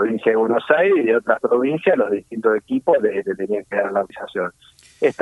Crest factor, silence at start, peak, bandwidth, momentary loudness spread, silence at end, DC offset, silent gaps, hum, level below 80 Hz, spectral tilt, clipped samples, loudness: 16 dB; 0 s; -2 dBFS; 11.5 kHz; 9 LU; 0.1 s; under 0.1%; none; none; -66 dBFS; -7 dB/octave; under 0.1%; -19 LUFS